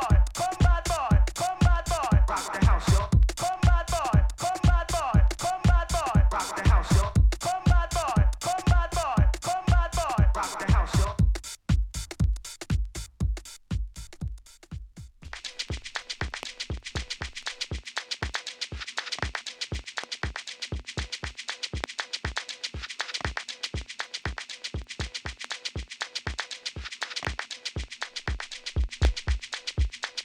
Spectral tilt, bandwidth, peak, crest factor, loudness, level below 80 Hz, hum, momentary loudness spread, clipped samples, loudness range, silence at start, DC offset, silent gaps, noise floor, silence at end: -5 dB/octave; 14.5 kHz; -6 dBFS; 20 dB; -28 LUFS; -28 dBFS; none; 11 LU; under 0.1%; 10 LU; 0 s; under 0.1%; none; -45 dBFS; 0 s